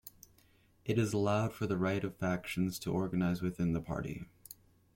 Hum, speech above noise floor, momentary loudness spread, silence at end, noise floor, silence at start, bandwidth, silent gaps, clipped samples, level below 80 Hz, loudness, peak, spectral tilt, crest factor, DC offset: none; 33 dB; 18 LU; 0.4 s; -67 dBFS; 0.05 s; 16.5 kHz; none; under 0.1%; -58 dBFS; -35 LUFS; -20 dBFS; -6.5 dB/octave; 16 dB; under 0.1%